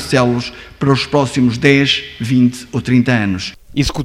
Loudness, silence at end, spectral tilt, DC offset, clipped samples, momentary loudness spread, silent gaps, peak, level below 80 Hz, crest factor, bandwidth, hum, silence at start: -15 LUFS; 0 s; -5.5 dB/octave; under 0.1%; under 0.1%; 10 LU; none; 0 dBFS; -38 dBFS; 14 dB; 13.5 kHz; none; 0 s